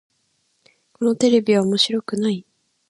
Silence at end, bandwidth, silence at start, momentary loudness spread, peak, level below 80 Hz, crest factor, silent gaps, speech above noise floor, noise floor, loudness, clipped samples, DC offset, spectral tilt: 0.5 s; 11.5 kHz; 1 s; 8 LU; -4 dBFS; -68 dBFS; 18 dB; none; 49 dB; -67 dBFS; -19 LUFS; under 0.1%; under 0.1%; -5 dB/octave